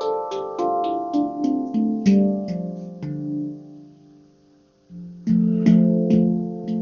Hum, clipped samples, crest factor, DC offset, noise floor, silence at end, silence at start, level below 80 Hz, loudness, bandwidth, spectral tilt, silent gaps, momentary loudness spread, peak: none; under 0.1%; 18 dB; under 0.1%; -56 dBFS; 0 s; 0 s; -54 dBFS; -21 LUFS; 6.8 kHz; -9 dB/octave; none; 15 LU; -4 dBFS